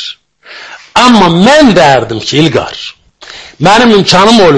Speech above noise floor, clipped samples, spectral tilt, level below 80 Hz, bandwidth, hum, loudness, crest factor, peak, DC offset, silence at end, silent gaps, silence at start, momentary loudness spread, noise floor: 27 dB; 4%; -4.5 dB/octave; -36 dBFS; 11 kHz; none; -5 LUFS; 6 dB; 0 dBFS; under 0.1%; 0 s; none; 0 s; 21 LU; -32 dBFS